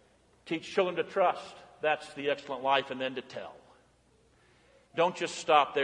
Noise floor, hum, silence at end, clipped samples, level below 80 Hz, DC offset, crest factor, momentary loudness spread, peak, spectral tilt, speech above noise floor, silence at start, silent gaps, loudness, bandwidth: -65 dBFS; none; 0 s; under 0.1%; -74 dBFS; under 0.1%; 24 dB; 15 LU; -8 dBFS; -3.5 dB/octave; 35 dB; 0.45 s; none; -31 LUFS; 11 kHz